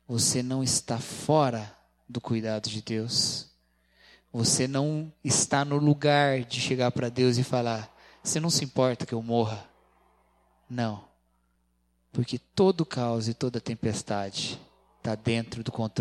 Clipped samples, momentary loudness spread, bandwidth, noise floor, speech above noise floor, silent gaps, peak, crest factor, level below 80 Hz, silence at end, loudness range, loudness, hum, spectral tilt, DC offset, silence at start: under 0.1%; 12 LU; 14.5 kHz; -71 dBFS; 44 dB; none; -8 dBFS; 20 dB; -62 dBFS; 0 s; 6 LU; -27 LUFS; 60 Hz at -55 dBFS; -4.5 dB/octave; under 0.1%; 0.1 s